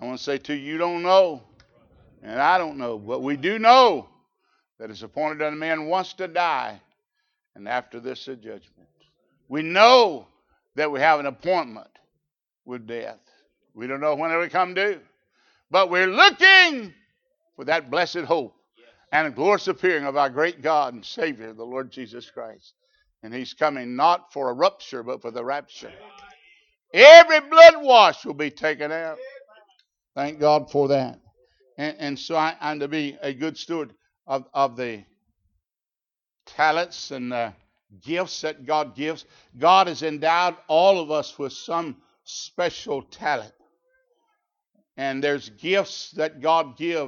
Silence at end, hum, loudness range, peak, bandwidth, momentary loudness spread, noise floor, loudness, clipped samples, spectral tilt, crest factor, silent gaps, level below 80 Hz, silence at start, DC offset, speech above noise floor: 0 s; none; 15 LU; 0 dBFS; 7.2 kHz; 21 LU; under -90 dBFS; -19 LUFS; under 0.1%; -3.5 dB/octave; 22 dB; none; -70 dBFS; 0 s; under 0.1%; over 70 dB